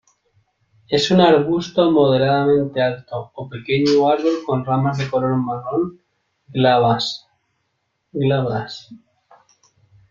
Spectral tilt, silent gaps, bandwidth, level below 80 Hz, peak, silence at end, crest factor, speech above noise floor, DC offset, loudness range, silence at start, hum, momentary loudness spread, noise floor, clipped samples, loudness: -6.5 dB/octave; none; 7.6 kHz; -56 dBFS; -2 dBFS; 1.15 s; 18 dB; 54 dB; under 0.1%; 4 LU; 0.9 s; none; 15 LU; -71 dBFS; under 0.1%; -18 LUFS